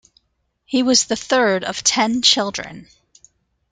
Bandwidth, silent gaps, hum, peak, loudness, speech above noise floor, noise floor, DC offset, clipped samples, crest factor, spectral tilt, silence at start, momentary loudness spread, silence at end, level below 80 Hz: 9.6 kHz; none; none; 0 dBFS; -17 LUFS; 51 dB; -69 dBFS; under 0.1%; under 0.1%; 20 dB; -1.5 dB/octave; 0.7 s; 10 LU; 0.9 s; -58 dBFS